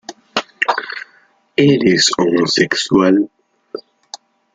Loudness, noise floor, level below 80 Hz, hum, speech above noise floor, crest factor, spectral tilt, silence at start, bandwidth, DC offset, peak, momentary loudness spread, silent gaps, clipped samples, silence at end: -15 LUFS; -53 dBFS; -56 dBFS; none; 40 dB; 16 dB; -4 dB/octave; 0.1 s; 9.6 kHz; under 0.1%; 0 dBFS; 21 LU; none; under 0.1%; 0.4 s